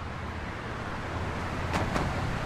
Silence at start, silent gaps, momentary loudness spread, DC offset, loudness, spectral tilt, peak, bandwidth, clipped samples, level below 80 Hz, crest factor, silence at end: 0 s; none; 7 LU; under 0.1%; -33 LUFS; -6 dB/octave; -12 dBFS; 14.5 kHz; under 0.1%; -42 dBFS; 20 dB; 0 s